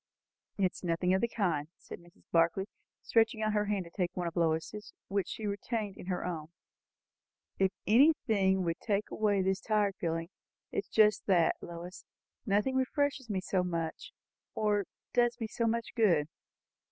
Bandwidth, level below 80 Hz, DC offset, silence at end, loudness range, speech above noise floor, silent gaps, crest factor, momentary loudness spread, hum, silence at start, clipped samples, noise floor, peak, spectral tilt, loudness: 8 kHz; -68 dBFS; under 0.1%; 0.65 s; 4 LU; over 59 dB; none; 20 dB; 15 LU; none; 0.6 s; under 0.1%; under -90 dBFS; -12 dBFS; -6.5 dB/octave; -31 LUFS